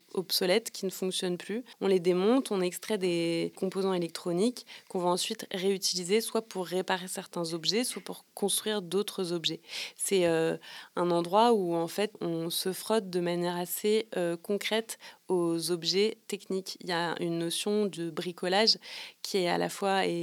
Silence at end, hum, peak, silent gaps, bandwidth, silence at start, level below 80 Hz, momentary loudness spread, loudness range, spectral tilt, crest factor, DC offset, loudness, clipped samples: 0 s; none; -10 dBFS; none; 19.5 kHz; 0.15 s; -88 dBFS; 9 LU; 2 LU; -4 dB/octave; 20 dB; under 0.1%; -30 LUFS; under 0.1%